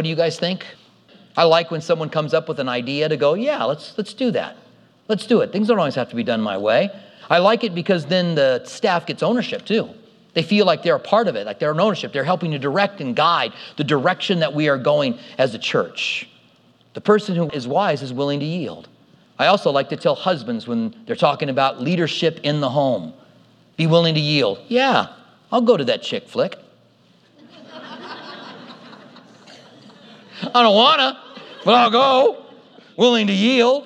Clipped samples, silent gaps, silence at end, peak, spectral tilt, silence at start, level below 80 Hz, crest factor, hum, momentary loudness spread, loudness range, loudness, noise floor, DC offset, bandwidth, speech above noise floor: under 0.1%; none; 0 s; 0 dBFS; -5.5 dB/octave; 0 s; -74 dBFS; 18 dB; none; 12 LU; 6 LU; -19 LUFS; -55 dBFS; under 0.1%; 10.5 kHz; 36 dB